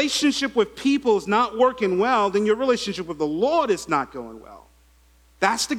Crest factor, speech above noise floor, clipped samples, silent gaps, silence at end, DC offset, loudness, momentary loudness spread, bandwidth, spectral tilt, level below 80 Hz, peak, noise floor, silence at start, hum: 18 dB; 34 dB; under 0.1%; none; 0 s; under 0.1%; -22 LUFS; 7 LU; 15.5 kHz; -3.5 dB/octave; -56 dBFS; -4 dBFS; -56 dBFS; 0 s; none